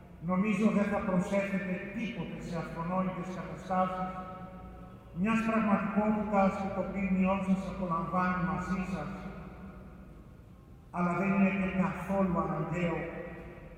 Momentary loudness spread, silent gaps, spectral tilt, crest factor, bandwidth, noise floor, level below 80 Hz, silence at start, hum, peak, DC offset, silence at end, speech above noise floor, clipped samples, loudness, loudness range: 17 LU; none; -8 dB/octave; 18 dB; 9.2 kHz; -53 dBFS; -52 dBFS; 0 s; none; -14 dBFS; under 0.1%; 0 s; 22 dB; under 0.1%; -32 LUFS; 6 LU